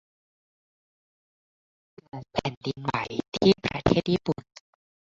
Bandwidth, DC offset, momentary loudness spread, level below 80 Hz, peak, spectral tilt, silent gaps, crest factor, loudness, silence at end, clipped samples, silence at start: 7.8 kHz; under 0.1%; 12 LU; -50 dBFS; -4 dBFS; -6.5 dB/octave; 2.57-2.61 s, 3.28-3.32 s; 26 dB; -27 LUFS; 0.8 s; under 0.1%; 2.15 s